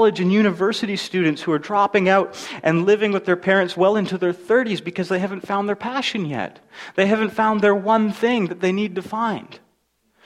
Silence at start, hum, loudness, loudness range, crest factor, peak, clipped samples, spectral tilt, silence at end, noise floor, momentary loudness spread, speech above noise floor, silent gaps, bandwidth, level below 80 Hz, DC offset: 0 s; none; -20 LUFS; 3 LU; 18 dB; -2 dBFS; under 0.1%; -6 dB/octave; 0.7 s; -66 dBFS; 8 LU; 46 dB; none; 12.5 kHz; -64 dBFS; under 0.1%